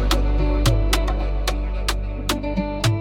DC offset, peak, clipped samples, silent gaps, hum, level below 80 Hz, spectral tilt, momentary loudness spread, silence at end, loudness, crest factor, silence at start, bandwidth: under 0.1%; -4 dBFS; under 0.1%; none; none; -22 dBFS; -5 dB/octave; 5 LU; 0 s; -23 LUFS; 16 dB; 0 s; 17 kHz